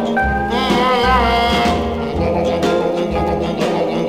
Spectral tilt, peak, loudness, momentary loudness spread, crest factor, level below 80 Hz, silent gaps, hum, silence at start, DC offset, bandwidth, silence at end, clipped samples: -5.5 dB/octave; -4 dBFS; -16 LUFS; 5 LU; 12 dB; -28 dBFS; none; none; 0 s; under 0.1%; 16 kHz; 0 s; under 0.1%